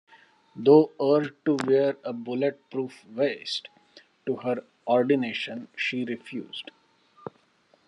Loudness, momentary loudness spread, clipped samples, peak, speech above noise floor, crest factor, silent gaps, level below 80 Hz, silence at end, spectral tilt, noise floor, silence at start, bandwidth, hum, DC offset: -26 LUFS; 18 LU; under 0.1%; -6 dBFS; 39 dB; 20 dB; none; -80 dBFS; 0.6 s; -6 dB/octave; -64 dBFS; 0.55 s; 10.5 kHz; none; under 0.1%